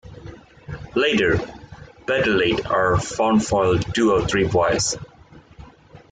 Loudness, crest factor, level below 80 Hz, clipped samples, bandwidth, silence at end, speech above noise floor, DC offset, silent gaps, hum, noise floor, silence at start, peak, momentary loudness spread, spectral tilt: -20 LUFS; 14 dB; -42 dBFS; under 0.1%; 9.6 kHz; 0.15 s; 28 dB; under 0.1%; none; none; -47 dBFS; 0.05 s; -6 dBFS; 18 LU; -4.5 dB/octave